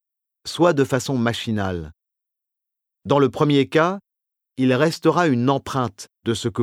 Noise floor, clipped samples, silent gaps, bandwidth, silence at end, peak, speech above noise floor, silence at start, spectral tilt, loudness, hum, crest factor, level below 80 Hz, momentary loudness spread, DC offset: -84 dBFS; under 0.1%; none; 15.5 kHz; 0 s; -4 dBFS; 65 dB; 0.45 s; -6 dB/octave; -20 LUFS; none; 18 dB; -54 dBFS; 14 LU; under 0.1%